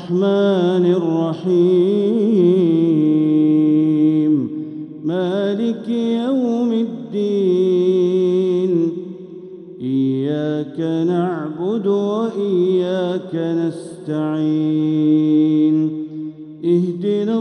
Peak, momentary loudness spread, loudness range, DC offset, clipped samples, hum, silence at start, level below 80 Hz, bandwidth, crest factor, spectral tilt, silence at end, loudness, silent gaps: -4 dBFS; 11 LU; 5 LU; under 0.1%; under 0.1%; none; 0 s; -70 dBFS; 9 kHz; 12 dB; -9 dB/octave; 0 s; -17 LUFS; none